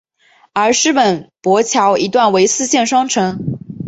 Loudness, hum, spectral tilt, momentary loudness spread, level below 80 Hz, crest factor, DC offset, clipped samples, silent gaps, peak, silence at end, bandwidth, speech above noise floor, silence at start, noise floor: -14 LUFS; none; -3.5 dB/octave; 8 LU; -54 dBFS; 14 dB; under 0.1%; under 0.1%; none; 0 dBFS; 0 s; 8.2 kHz; 39 dB; 0.55 s; -52 dBFS